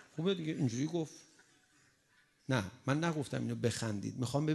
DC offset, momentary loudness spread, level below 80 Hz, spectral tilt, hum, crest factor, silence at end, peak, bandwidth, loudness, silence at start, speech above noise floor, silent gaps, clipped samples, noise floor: under 0.1%; 5 LU; -66 dBFS; -6 dB/octave; none; 20 dB; 0 s; -16 dBFS; 12 kHz; -36 LUFS; 0 s; 36 dB; none; under 0.1%; -71 dBFS